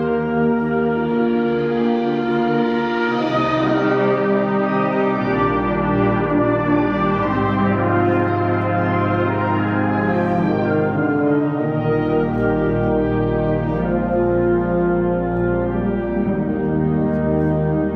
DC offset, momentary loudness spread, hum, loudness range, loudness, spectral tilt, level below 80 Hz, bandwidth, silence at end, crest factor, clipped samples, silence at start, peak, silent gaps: under 0.1%; 2 LU; none; 1 LU; -18 LUFS; -9.5 dB/octave; -38 dBFS; 6.6 kHz; 0 s; 12 dB; under 0.1%; 0 s; -6 dBFS; none